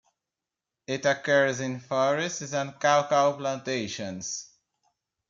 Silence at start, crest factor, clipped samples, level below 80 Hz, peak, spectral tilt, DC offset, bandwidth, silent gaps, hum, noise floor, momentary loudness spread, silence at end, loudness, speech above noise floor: 0.9 s; 20 dB; under 0.1%; -74 dBFS; -8 dBFS; -3.5 dB/octave; under 0.1%; 7.6 kHz; none; none; -88 dBFS; 11 LU; 0.85 s; -27 LUFS; 62 dB